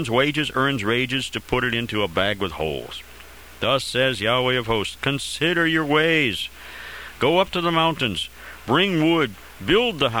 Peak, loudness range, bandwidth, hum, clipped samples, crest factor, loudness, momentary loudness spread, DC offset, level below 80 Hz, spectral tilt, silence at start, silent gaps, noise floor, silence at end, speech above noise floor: -4 dBFS; 3 LU; over 20 kHz; none; under 0.1%; 18 dB; -21 LUFS; 13 LU; 0.3%; -46 dBFS; -4.5 dB/octave; 0 s; none; -43 dBFS; 0 s; 22 dB